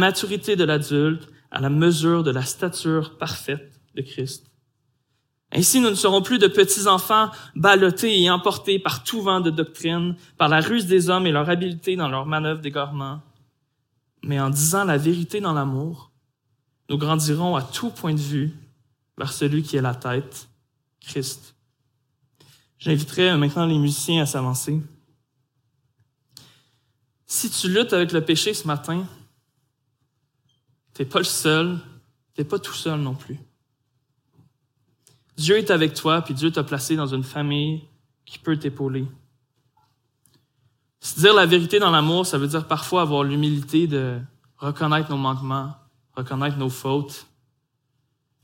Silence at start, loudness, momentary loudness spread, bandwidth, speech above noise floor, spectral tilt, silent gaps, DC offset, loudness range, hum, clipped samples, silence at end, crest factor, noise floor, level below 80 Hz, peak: 0 s; -21 LUFS; 15 LU; 17 kHz; 51 dB; -4.5 dB/octave; none; under 0.1%; 10 LU; none; under 0.1%; 1.2 s; 22 dB; -72 dBFS; -66 dBFS; 0 dBFS